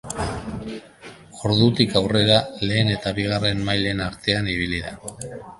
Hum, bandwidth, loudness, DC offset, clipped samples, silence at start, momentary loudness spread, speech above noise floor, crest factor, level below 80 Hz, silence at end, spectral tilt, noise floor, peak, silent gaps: none; 11.5 kHz; -21 LUFS; under 0.1%; under 0.1%; 0.05 s; 17 LU; 22 dB; 22 dB; -42 dBFS; 0.05 s; -5 dB/octave; -44 dBFS; 0 dBFS; none